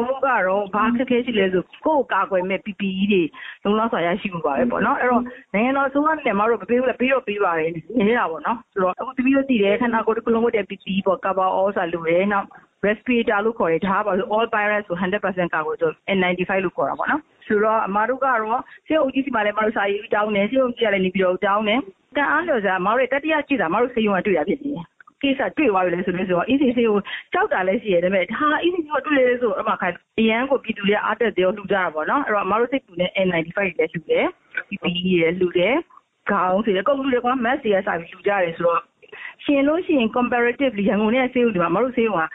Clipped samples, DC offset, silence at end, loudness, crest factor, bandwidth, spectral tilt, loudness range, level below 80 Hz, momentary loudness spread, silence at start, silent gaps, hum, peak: under 0.1%; under 0.1%; 0 s; -21 LUFS; 16 dB; 4 kHz; -9 dB/octave; 1 LU; -56 dBFS; 5 LU; 0 s; none; none; -6 dBFS